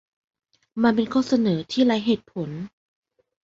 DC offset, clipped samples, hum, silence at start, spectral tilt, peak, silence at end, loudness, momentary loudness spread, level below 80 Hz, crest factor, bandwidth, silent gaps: under 0.1%; under 0.1%; none; 0.75 s; -6.5 dB/octave; -6 dBFS; 0.75 s; -22 LUFS; 15 LU; -62 dBFS; 18 dB; 7.6 kHz; none